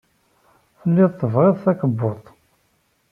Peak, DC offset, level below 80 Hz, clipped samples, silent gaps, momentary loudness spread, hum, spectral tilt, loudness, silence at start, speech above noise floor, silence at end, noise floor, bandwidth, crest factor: -4 dBFS; under 0.1%; -62 dBFS; under 0.1%; none; 10 LU; none; -11.5 dB/octave; -19 LUFS; 0.85 s; 47 dB; 0.9 s; -65 dBFS; 3.4 kHz; 18 dB